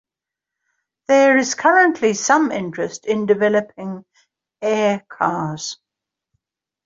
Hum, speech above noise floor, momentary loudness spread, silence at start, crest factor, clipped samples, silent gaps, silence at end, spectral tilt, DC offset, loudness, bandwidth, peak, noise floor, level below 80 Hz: none; 69 dB; 17 LU; 1.1 s; 18 dB; under 0.1%; none; 1.1 s; -4 dB/octave; under 0.1%; -17 LUFS; 7.8 kHz; -2 dBFS; -86 dBFS; -66 dBFS